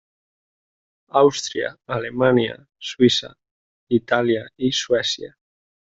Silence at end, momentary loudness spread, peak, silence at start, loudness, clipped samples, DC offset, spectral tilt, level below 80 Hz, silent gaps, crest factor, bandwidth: 0.6 s; 11 LU; -2 dBFS; 1.15 s; -20 LUFS; under 0.1%; under 0.1%; -4.5 dB/octave; -56 dBFS; 3.51-3.87 s; 20 dB; 8 kHz